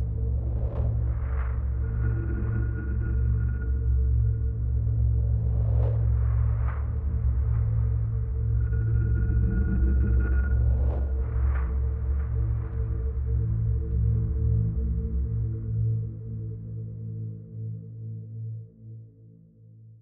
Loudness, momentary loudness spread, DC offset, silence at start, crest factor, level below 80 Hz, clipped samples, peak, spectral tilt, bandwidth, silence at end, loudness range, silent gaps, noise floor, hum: -28 LUFS; 12 LU; under 0.1%; 0 s; 12 dB; -28 dBFS; under 0.1%; -14 dBFS; -13.5 dB/octave; 2.4 kHz; 0.05 s; 7 LU; none; -52 dBFS; none